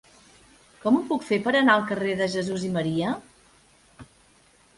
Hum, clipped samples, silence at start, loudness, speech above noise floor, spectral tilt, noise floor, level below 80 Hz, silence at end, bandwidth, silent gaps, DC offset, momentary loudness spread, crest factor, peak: none; under 0.1%; 0.85 s; -24 LUFS; 35 dB; -5.5 dB/octave; -59 dBFS; -62 dBFS; 0.75 s; 11.5 kHz; none; under 0.1%; 9 LU; 22 dB; -6 dBFS